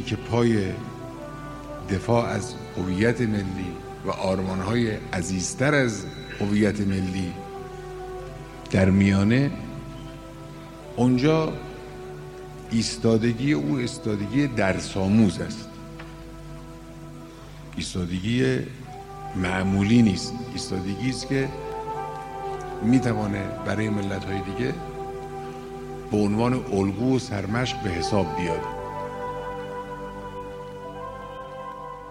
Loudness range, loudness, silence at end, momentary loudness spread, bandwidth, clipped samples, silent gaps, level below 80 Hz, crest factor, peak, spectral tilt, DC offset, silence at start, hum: 5 LU; -25 LUFS; 0 s; 17 LU; 15 kHz; under 0.1%; none; -46 dBFS; 18 dB; -8 dBFS; -6 dB/octave; under 0.1%; 0 s; 50 Hz at -45 dBFS